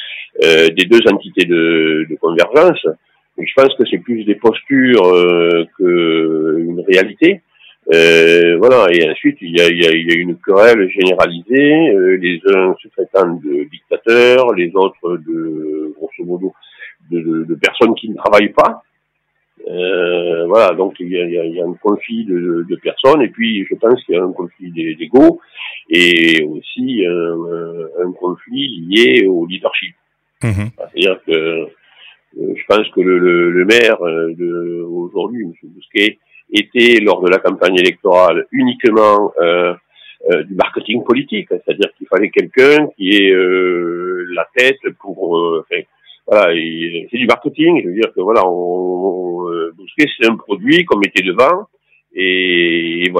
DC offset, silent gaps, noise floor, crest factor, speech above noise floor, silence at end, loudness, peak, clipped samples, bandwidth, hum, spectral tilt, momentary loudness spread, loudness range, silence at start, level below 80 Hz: under 0.1%; none; -66 dBFS; 12 dB; 54 dB; 0 s; -13 LUFS; 0 dBFS; 0.2%; 13.5 kHz; none; -5 dB/octave; 13 LU; 5 LU; 0 s; -56 dBFS